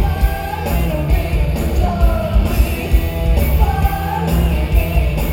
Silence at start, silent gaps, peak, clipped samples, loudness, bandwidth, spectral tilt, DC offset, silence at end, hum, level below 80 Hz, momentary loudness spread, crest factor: 0 s; none; 0 dBFS; under 0.1%; -17 LUFS; 17.5 kHz; -6.5 dB/octave; under 0.1%; 0 s; none; -16 dBFS; 3 LU; 14 dB